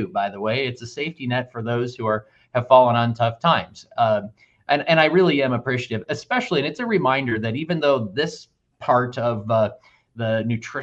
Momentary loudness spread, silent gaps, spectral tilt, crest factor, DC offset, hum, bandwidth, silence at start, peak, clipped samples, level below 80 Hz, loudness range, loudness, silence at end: 11 LU; none; -6.5 dB/octave; 20 dB; under 0.1%; none; 8 kHz; 0 s; 0 dBFS; under 0.1%; -62 dBFS; 4 LU; -21 LUFS; 0 s